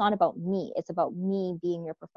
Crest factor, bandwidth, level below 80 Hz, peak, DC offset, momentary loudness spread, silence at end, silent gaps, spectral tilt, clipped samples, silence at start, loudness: 18 dB; 7 kHz; -70 dBFS; -12 dBFS; under 0.1%; 6 LU; 0.1 s; none; -8 dB/octave; under 0.1%; 0 s; -30 LUFS